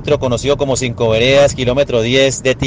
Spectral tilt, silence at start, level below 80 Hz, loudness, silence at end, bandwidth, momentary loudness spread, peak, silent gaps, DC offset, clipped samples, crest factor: -4.5 dB/octave; 0 s; -34 dBFS; -13 LUFS; 0 s; 10 kHz; 5 LU; 0 dBFS; none; under 0.1%; under 0.1%; 14 dB